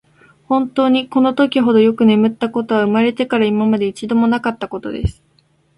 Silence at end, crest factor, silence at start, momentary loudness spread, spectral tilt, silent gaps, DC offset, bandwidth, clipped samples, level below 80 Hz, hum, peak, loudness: 0.65 s; 14 dB; 0.5 s; 10 LU; -7 dB/octave; none; under 0.1%; 11 kHz; under 0.1%; -38 dBFS; none; -2 dBFS; -16 LUFS